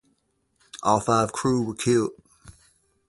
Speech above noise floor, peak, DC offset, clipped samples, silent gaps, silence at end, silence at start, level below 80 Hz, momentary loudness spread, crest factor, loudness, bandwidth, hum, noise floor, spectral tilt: 48 dB; -6 dBFS; under 0.1%; under 0.1%; none; 0.6 s; 0.75 s; -56 dBFS; 9 LU; 20 dB; -24 LUFS; 11.5 kHz; none; -70 dBFS; -5.5 dB/octave